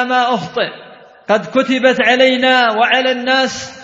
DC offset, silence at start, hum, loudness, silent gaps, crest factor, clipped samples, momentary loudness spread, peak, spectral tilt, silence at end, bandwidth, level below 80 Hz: under 0.1%; 0 s; none; -13 LUFS; none; 14 dB; under 0.1%; 9 LU; 0 dBFS; -3.5 dB/octave; 0 s; 7.8 kHz; -60 dBFS